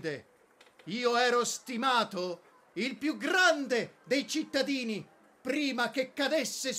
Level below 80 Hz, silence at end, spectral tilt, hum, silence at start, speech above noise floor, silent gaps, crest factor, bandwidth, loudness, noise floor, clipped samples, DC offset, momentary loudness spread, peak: -84 dBFS; 0 s; -2.5 dB/octave; none; 0 s; 31 dB; none; 18 dB; 16 kHz; -30 LUFS; -62 dBFS; under 0.1%; under 0.1%; 14 LU; -14 dBFS